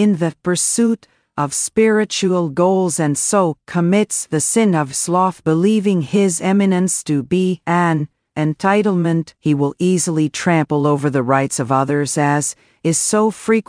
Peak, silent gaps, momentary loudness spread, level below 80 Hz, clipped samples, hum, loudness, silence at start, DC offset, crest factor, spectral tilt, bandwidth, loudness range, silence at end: -2 dBFS; none; 5 LU; -58 dBFS; under 0.1%; none; -17 LUFS; 0 s; under 0.1%; 14 dB; -5 dB/octave; 10.5 kHz; 1 LU; 0.05 s